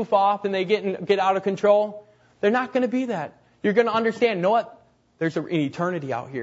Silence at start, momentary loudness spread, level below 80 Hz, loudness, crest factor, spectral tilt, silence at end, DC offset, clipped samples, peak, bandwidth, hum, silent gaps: 0 s; 9 LU; -70 dBFS; -23 LUFS; 18 dB; -6.5 dB/octave; 0 s; under 0.1%; under 0.1%; -6 dBFS; 8 kHz; none; none